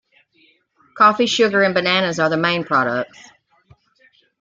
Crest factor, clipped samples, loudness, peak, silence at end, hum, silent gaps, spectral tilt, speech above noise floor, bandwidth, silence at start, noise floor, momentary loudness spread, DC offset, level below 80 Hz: 18 dB; under 0.1%; -16 LUFS; -2 dBFS; 1.35 s; none; none; -4 dB/octave; 41 dB; 9 kHz; 0.95 s; -58 dBFS; 7 LU; under 0.1%; -64 dBFS